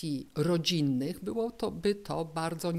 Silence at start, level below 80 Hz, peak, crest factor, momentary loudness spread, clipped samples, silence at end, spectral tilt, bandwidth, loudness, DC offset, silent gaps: 0 s; -60 dBFS; -14 dBFS; 16 dB; 7 LU; under 0.1%; 0 s; -5.5 dB/octave; 16 kHz; -32 LUFS; under 0.1%; none